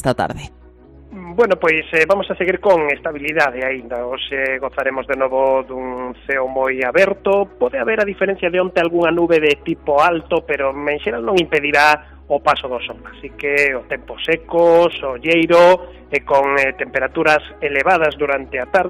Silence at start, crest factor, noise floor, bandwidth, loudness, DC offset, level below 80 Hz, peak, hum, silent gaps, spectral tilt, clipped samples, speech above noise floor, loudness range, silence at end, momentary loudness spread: 0 s; 16 dB; -43 dBFS; 14.5 kHz; -16 LUFS; under 0.1%; -44 dBFS; -2 dBFS; none; none; -5 dB/octave; under 0.1%; 26 dB; 4 LU; 0 s; 11 LU